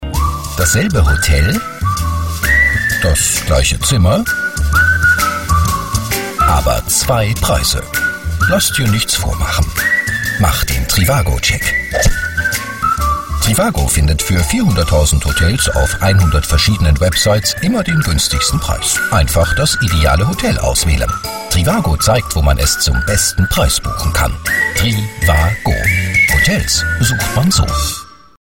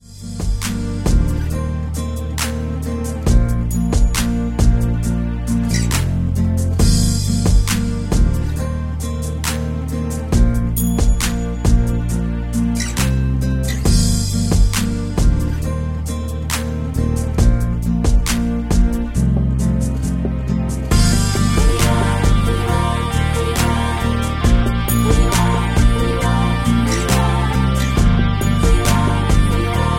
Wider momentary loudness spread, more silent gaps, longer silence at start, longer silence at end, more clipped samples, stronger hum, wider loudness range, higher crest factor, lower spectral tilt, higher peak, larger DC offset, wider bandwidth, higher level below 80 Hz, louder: about the same, 5 LU vs 7 LU; neither; about the same, 0 s vs 0.1 s; first, 0.25 s vs 0 s; neither; neither; about the same, 2 LU vs 3 LU; about the same, 12 dB vs 14 dB; second, -3.5 dB/octave vs -5.5 dB/octave; about the same, 0 dBFS vs -2 dBFS; neither; about the same, 16.5 kHz vs 16.5 kHz; about the same, -20 dBFS vs -20 dBFS; first, -13 LUFS vs -18 LUFS